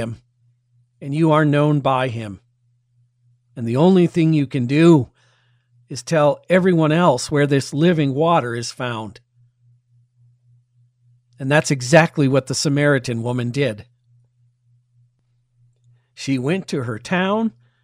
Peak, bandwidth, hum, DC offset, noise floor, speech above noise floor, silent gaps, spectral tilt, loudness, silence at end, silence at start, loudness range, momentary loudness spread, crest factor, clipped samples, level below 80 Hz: 0 dBFS; 14 kHz; none; under 0.1%; -64 dBFS; 47 dB; none; -6 dB/octave; -18 LUFS; 0.35 s; 0 s; 9 LU; 16 LU; 20 dB; under 0.1%; -58 dBFS